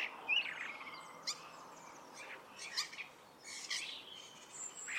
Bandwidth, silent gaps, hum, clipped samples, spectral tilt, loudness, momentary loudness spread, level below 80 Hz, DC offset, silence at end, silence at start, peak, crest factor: 16.5 kHz; none; none; under 0.1%; 1 dB/octave; -42 LUFS; 19 LU; -88 dBFS; under 0.1%; 0 s; 0 s; -24 dBFS; 22 dB